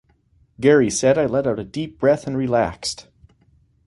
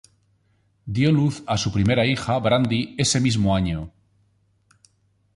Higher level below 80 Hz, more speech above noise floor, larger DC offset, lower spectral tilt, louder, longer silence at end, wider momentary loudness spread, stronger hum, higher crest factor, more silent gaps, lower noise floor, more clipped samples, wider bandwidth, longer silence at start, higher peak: second, -50 dBFS vs -44 dBFS; second, 40 dB vs 44 dB; neither; about the same, -5 dB/octave vs -5 dB/octave; about the same, -20 LUFS vs -21 LUFS; second, 0.85 s vs 1.45 s; about the same, 12 LU vs 10 LU; neither; about the same, 18 dB vs 16 dB; neither; second, -59 dBFS vs -64 dBFS; neither; about the same, 11.5 kHz vs 11.5 kHz; second, 0.6 s vs 0.85 s; first, -2 dBFS vs -8 dBFS